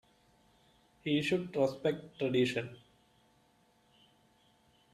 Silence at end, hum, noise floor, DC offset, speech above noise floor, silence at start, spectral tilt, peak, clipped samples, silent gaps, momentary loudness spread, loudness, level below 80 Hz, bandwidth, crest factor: 2.15 s; none; -69 dBFS; under 0.1%; 37 dB; 1.05 s; -6 dB/octave; -18 dBFS; under 0.1%; none; 9 LU; -33 LUFS; -72 dBFS; 13.5 kHz; 20 dB